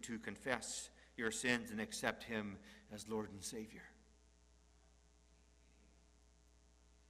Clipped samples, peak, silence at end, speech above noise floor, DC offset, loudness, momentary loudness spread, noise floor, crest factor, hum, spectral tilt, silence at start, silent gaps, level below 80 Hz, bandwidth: under 0.1%; -18 dBFS; 0.15 s; 25 dB; under 0.1%; -43 LUFS; 16 LU; -69 dBFS; 28 dB; none; -3 dB/octave; 0 s; none; -70 dBFS; 15.5 kHz